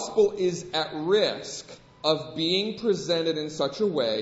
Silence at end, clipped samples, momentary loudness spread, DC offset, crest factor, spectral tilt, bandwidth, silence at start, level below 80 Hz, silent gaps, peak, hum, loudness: 0 s; under 0.1%; 7 LU; under 0.1%; 18 dB; -4 dB/octave; 8 kHz; 0 s; -64 dBFS; none; -8 dBFS; none; -26 LUFS